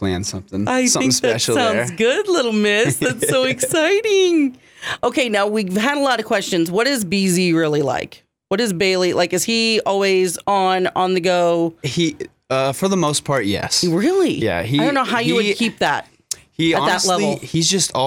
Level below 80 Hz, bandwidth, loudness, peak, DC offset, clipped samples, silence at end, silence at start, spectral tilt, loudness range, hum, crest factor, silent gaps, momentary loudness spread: -54 dBFS; 18.5 kHz; -17 LUFS; -4 dBFS; under 0.1%; under 0.1%; 0 s; 0 s; -3.5 dB/octave; 2 LU; none; 14 dB; none; 6 LU